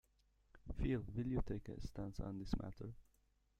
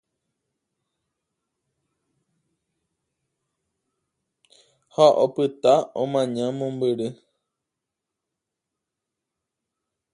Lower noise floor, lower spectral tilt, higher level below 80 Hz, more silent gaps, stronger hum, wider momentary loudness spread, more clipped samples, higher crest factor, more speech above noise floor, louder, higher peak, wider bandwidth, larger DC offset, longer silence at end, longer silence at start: second, -77 dBFS vs -84 dBFS; first, -8 dB/octave vs -6 dB/octave; first, -52 dBFS vs -76 dBFS; neither; neither; about the same, 12 LU vs 11 LU; neither; about the same, 22 dB vs 24 dB; second, 34 dB vs 64 dB; second, -46 LUFS vs -22 LUFS; second, -24 dBFS vs -4 dBFS; about the same, 10 kHz vs 11 kHz; neither; second, 0.6 s vs 3 s; second, 0.55 s vs 5 s